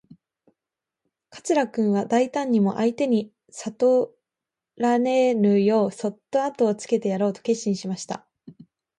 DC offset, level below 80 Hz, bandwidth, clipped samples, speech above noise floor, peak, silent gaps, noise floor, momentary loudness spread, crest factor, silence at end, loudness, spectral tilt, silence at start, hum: under 0.1%; -72 dBFS; 11 kHz; under 0.1%; 66 dB; -10 dBFS; none; -88 dBFS; 13 LU; 14 dB; 0.5 s; -23 LUFS; -6 dB/octave; 1.35 s; none